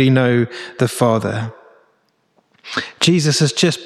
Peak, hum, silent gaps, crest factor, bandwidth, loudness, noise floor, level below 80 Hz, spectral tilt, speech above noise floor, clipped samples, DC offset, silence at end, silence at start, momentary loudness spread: -2 dBFS; none; none; 16 dB; 14 kHz; -17 LUFS; -62 dBFS; -60 dBFS; -5 dB/octave; 46 dB; under 0.1%; under 0.1%; 0 s; 0 s; 11 LU